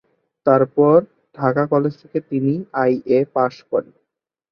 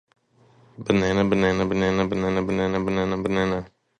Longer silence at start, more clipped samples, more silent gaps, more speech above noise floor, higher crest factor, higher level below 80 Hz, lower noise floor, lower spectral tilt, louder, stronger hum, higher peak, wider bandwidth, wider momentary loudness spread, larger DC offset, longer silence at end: second, 0.45 s vs 0.8 s; neither; neither; first, 60 dB vs 35 dB; about the same, 16 dB vs 18 dB; second, -62 dBFS vs -46 dBFS; first, -78 dBFS vs -57 dBFS; first, -10 dB/octave vs -6.5 dB/octave; first, -19 LUFS vs -23 LUFS; neither; first, -2 dBFS vs -6 dBFS; second, 6.4 kHz vs 9.2 kHz; first, 10 LU vs 4 LU; neither; first, 0.7 s vs 0.3 s